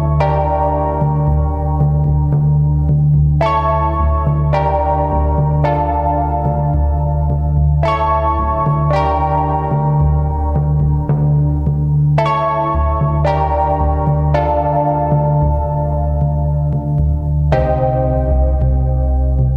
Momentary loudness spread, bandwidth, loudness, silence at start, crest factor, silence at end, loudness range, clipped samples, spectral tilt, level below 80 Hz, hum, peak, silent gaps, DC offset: 3 LU; 5.4 kHz; -15 LUFS; 0 s; 12 dB; 0 s; 1 LU; under 0.1%; -10.5 dB/octave; -20 dBFS; none; -2 dBFS; none; under 0.1%